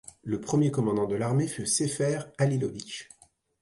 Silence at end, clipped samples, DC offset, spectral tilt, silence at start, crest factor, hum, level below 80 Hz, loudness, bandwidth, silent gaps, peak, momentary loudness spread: 0.6 s; under 0.1%; under 0.1%; -5.5 dB/octave; 0.25 s; 14 dB; none; -62 dBFS; -28 LUFS; 11.5 kHz; none; -14 dBFS; 9 LU